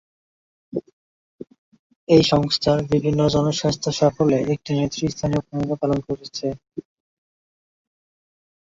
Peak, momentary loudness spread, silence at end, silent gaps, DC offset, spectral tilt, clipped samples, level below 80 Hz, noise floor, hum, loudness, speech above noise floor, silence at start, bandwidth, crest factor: -2 dBFS; 15 LU; 1.85 s; 0.93-1.38 s, 1.58-1.72 s, 1.79-1.90 s, 1.96-2.07 s; under 0.1%; -6 dB/octave; under 0.1%; -48 dBFS; under -90 dBFS; none; -21 LUFS; over 70 dB; 0.75 s; 7.8 kHz; 20 dB